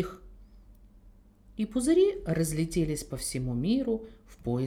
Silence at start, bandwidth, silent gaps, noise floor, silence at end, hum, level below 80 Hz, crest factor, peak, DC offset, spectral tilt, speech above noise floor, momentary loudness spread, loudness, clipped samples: 0 s; 17 kHz; none; -56 dBFS; 0 s; none; -48 dBFS; 16 dB; -14 dBFS; under 0.1%; -6 dB/octave; 27 dB; 15 LU; -29 LUFS; under 0.1%